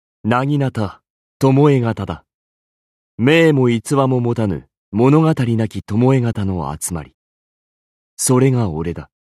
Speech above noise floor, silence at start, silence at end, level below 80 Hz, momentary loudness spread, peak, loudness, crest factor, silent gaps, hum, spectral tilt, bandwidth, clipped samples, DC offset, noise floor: over 75 dB; 0.25 s; 0.3 s; -46 dBFS; 13 LU; -2 dBFS; -16 LUFS; 16 dB; 1.10-1.40 s, 2.34-3.18 s, 4.77-4.92 s, 7.14-8.17 s; none; -6.5 dB/octave; 14 kHz; under 0.1%; under 0.1%; under -90 dBFS